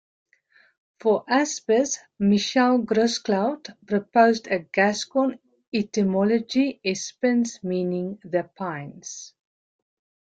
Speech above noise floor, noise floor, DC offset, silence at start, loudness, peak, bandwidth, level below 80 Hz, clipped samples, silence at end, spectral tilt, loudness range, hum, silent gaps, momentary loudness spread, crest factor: 37 dB; -60 dBFS; under 0.1%; 1.05 s; -23 LUFS; -6 dBFS; 9 kHz; -66 dBFS; under 0.1%; 1.1 s; -4.5 dB/octave; 5 LU; none; 5.67-5.72 s; 11 LU; 18 dB